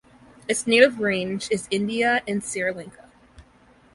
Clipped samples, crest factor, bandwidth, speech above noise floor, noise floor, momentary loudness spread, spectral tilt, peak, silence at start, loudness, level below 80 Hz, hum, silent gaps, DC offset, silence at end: under 0.1%; 22 dB; 11.5 kHz; 33 dB; -55 dBFS; 14 LU; -3.5 dB/octave; -2 dBFS; 0.5 s; -22 LUFS; -58 dBFS; none; none; under 0.1%; 0.55 s